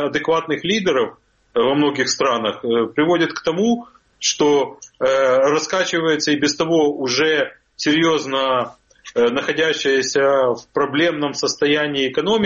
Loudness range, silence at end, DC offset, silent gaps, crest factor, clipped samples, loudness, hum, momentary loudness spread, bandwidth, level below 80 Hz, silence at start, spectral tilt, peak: 1 LU; 0 s; under 0.1%; none; 14 dB; under 0.1%; -18 LUFS; none; 5 LU; 7.6 kHz; -58 dBFS; 0 s; -3.5 dB/octave; -4 dBFS